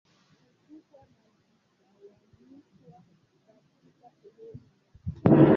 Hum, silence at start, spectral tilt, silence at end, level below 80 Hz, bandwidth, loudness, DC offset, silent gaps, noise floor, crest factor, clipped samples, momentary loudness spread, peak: none; 5.05 s; -11 dB/octave; 0 s; -56 dBFS; 4.4 kHz; -24 LUFS; under 0.1%; none; -69 dBFS; 24 dB; under 0.1%; 31 LU; -6 dBFS